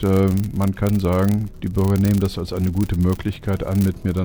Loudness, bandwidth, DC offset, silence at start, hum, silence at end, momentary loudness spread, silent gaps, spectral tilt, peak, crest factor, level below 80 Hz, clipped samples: -20 LUFS; over 20 kHz; under 0.1%; 0 s; none; 0 s; 6 LU; none; -8 dB/octave; -6 dBFS; 14 dB; -36 dBFS; under 0.1%